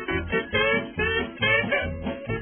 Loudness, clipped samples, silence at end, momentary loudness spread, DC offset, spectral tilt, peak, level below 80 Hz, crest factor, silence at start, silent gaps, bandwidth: -24 LUFS; under 0.1%; 0 s; 9 LU; under 0.1%; -9 dB/octave; -10 dBFS; -42 dBFS; 14 dB; 0 s; none; 3.5 kHz